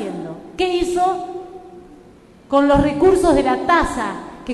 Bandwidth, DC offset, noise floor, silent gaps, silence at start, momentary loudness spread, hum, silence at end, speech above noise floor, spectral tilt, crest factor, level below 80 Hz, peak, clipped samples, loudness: 12.5 kHz; under 0.1%; -45 dBFS; none; 0 s; 17 LU; none; 0 s; 30 dB; -5.5 dB/octave; 16 dB; -36 dBFS; -2 dBFS; under 0.1%; -17 LUFS